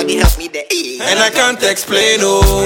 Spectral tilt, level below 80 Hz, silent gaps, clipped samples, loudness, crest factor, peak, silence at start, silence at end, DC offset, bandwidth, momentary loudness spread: -3 dB/octave; -20 dBFS; none; under 0.1%; -12 LUFS; 12 dB; 0 dBFS; 0 s; 0 s; under 0.1%; 17 kHz; 7 LU